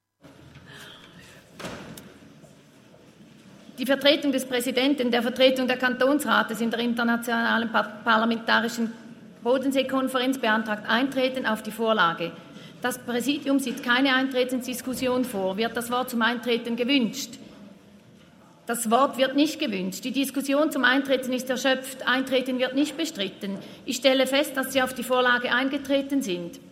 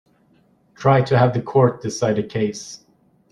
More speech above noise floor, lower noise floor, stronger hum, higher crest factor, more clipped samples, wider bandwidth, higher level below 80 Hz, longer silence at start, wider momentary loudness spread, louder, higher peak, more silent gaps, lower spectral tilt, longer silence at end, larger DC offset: second, 28 dB vs 40 dB; second, -53 dBFS vs -58 dBFS; neither; about the same, 20 dB vs 18 dB; neither; first, 16 kHz vs 10 kHz; second, -70 dBFS vs -56 dBFS; second, 0.25 s vs 0.8 s; second, 12 LU vs 16 LU; second, -24 LUFS vs -19 LUFS; about the same, -4 dBFS vs -2 dBFS; neither; second, -3.5 dB/octave vs -6.5 dB/octave; second, 0 s vs 0.55 s; neither